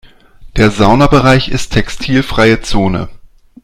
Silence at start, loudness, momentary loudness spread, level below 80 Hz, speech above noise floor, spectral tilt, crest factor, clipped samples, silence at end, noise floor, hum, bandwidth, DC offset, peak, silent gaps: 0.4 s; -11 LUFS; 9 LU; -24 dBFS; 26 dB; -6 dB/octave; 12 dB; 0.5%; 0.45 s; -35 dBFS; none; 14 kHz; under 0.1%; 0 dBFS; none